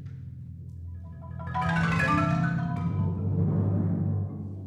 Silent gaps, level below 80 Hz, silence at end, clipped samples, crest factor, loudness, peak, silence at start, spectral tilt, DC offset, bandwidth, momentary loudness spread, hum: none; -48 dBFS; 0 s; under 0.1%; 16 dB; -27 LUFS; -12 dBFS; 0 s; -8 dB/octave; under 0.1%; 9.8 kHz; 17 LU; none